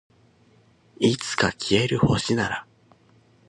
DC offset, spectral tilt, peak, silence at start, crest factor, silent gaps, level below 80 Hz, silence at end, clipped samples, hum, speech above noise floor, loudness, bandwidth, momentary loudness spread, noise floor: under 0.1%; -5 dB/octave; -6 dBFS; 1 s; 20 dB; none; -48 dBFS; 0.85 s; under 0.1%; none; 36 dB; -23 LUFS; 11.5 kHz; 5 LU; -58 dBFS